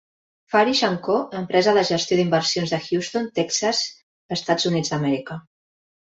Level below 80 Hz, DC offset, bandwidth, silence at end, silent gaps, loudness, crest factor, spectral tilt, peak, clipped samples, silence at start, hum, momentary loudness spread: -62 dBFS; under 0.1%; 8 kHz; 0.75 s; 4.03-4.29 s; -21 LUFS; 18 dB; -4 dB/octave; -4 dBFS; under 0.1%; 0.5 s; none; 9 LU